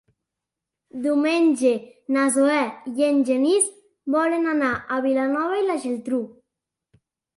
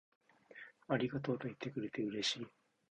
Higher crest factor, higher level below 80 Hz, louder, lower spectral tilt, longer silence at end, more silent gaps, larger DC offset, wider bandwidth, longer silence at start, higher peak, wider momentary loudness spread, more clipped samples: second, 16 dB vs 22 dB; first, -66 dBFS vs -76 dBFS; first, -22 LUFS vs -40 LUFS; second, -3 dB/octave vs -4.5 dB/octave; first, 1.1 s vs 0.4 s; neither; neither; first, 11.5 kHz vs 9.8 kHz; first, 0.95 s vs 0.5 s; first, -6 dBFS vs -20 dBFS; second, 9 LU vs 18 LU; neither